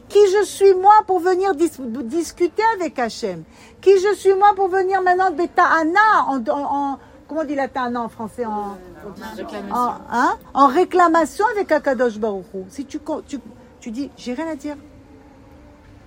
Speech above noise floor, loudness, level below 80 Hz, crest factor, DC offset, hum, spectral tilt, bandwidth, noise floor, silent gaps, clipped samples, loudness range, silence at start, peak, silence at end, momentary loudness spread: 27 dB; -18 LUFS; -54 dBFS; 18 dB; under 0.1%; none; -4.5 dB/octave; 16 kHz; -45 dBFS; none; under 0.1%; 10 LU; 0.1 s; 0 dBFS; 1.25 s; 17 LU